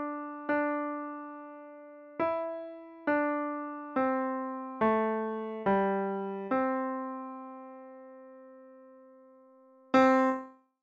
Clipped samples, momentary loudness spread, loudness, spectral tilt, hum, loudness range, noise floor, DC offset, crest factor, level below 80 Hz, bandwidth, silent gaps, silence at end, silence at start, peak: under 0.1%; 21 LU; -31 LUFS; -7 dB/octave; none; 6 LU; -59 dBFS; under 0.1%; 22 dB; -72 dBFS; 7.6 kHz; none; 0.3 s; 0 s; -10 dBFS